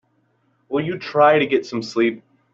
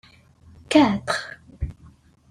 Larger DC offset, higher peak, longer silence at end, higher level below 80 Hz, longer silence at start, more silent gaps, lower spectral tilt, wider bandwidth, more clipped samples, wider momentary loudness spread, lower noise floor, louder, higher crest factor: neither; about the same, -4 dBFS vs -4 dBFS; second, 0.35 s vs 0.6 s; second, -64 dBFS vs -42 dBFS; about the same, 0.7 s vs 0.7 s; neither; about the same, -6 dB/octave vs -5 dB/octave; second, 7.8 kHz vs 11.5 kHz; neither; second, 11 LU vs 17 LU; first, -64 dBFS vs -52 dBFS; about the same, -19 LUFS vs -21 LUFS; about the same, 18 dB vs 20 dB